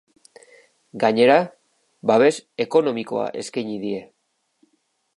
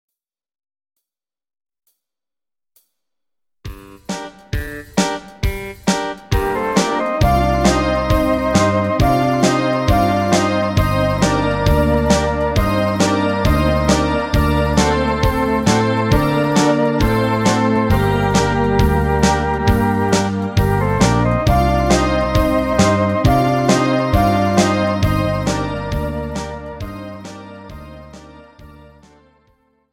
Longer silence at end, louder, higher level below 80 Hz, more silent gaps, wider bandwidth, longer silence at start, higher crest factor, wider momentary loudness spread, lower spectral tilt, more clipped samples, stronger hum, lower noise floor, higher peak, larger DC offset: about the same, 1.1 s vs 1.2 s; second, -21 LUFS vs -16 LUFS; second, -74 dBFS vs -26 dBFS; neither; second, 11.5 kHz vs 17 kHz; second, 0.95 s vs 3.65 s; about the same, 20 dB vs 16 dB; about the same, 13 LU vs 12 LU; about the same, -5 dB/octave vs -5.5 dB/octave; neither; neither; second, -71 dBFS vs under -90 dBFS; about the same, -2 dBFS vs -2 dBFS; neither